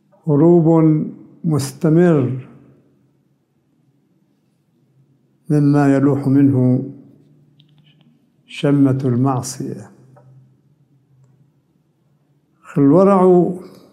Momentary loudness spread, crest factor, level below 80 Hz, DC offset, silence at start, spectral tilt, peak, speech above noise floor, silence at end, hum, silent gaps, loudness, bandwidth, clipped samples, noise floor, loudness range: 17 LU; 16 dB; -62 dBFS; under 0.1%; 0.25 s; -8.5 dB/octave; -2 dBFS; 48 dB; 0.25 s; none; none; -15 LUFS; 12.5 kHz; under 0.1%; -62 dBFS; 8 LU